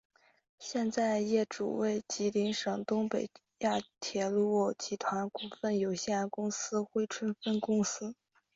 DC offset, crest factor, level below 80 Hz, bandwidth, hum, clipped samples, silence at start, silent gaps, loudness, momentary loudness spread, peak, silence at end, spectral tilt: under 0.1%; 16 dB; -74 dBFS; 7.8 kHz; none; under 0.1%; 0.6 s; none; -33 LUFS; 7 LU; -18 dBFS; 0.45 s; -4.5 dB/octave